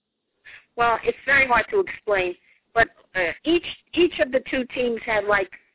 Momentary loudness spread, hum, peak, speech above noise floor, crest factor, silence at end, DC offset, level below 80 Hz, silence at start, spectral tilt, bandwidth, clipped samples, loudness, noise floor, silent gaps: 8 LU; none; -4 dBFS; 32 dB; 20 dB; 0.2 s; under 0.1%; -50 dBFS; 0.45 s; -7.5 dB/octave; 4 kHz; under 0.1%; -22 LUFS; -54 dBFS; none